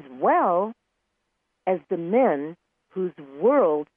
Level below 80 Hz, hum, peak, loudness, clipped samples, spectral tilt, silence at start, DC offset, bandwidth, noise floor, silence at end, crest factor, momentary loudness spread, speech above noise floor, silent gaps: -78 dBFS; none; -8 dBFS; -23 LUFS; under 0.1%; -10.5 dB/octave; 0.05 s; under 0.1%; 3.6 kHz; -77 dBFS; 0.1 s; 16 dB; 12 LU; 54 dB; none